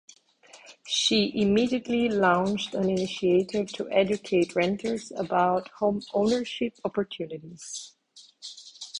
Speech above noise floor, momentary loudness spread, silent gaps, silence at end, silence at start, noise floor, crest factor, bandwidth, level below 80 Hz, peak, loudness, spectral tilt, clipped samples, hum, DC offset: 29 dB; 16 LU; none; 0 s; 0.55 s; -55 dBFS; 20 dB; 10.5 kHz; -62 dBFS; -8 dBFS; -26 LUFS; -4.5 dB/octave; under 0.1%; none; under 0.1%